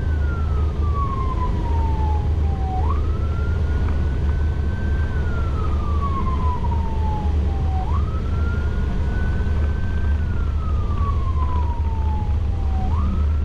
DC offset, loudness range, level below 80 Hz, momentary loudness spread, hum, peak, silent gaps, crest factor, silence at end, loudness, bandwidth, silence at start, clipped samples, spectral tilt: under 0.1%; 1 LU; -22 dBFS; 2 LU; none; -10 dBFS; none; 10 dB; 0 s; -23 LUFS; 5.8 kHz; 0 s; under 0.1%; -8.5 dB/octave